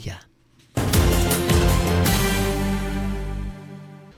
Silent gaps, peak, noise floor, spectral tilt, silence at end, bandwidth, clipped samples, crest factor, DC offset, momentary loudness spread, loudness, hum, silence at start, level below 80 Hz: none; -6 dBFS; -56 dBFS; -5 dB/octave; 0.1 s; 16 kHz; under 0.1%; 16 dB; under 0.1%; 19 LU; -21 LUFS; none; 0 s; -26 dBFS